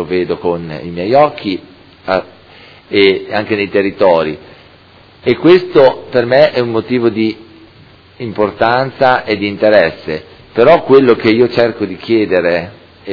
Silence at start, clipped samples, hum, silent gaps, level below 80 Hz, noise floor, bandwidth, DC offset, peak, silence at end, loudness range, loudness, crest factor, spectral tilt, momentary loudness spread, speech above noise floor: 0 s; 0.6%; none; none; -48 dBFS; -42 dBFS; 5.4 kHz; under 0.1%; 0 dBFS; 0 s; 4 LU; -12 LUFS; 12 dB; -8 dB/octave; 14 LU; 31 dB